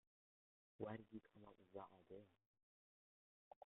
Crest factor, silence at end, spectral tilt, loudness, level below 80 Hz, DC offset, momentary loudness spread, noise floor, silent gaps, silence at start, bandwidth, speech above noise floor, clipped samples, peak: 26 dB; 0.15 s; -5 dB/octave; -59 LUFS; under -90 dBFS; under 0.1%; 14 LU; under -90 dBFS; 2.46-2.54 s, 2.63-3.61 s; 0.8 s; 3.8 kHz; over 32 dB; under 0.1%; -34 dBFS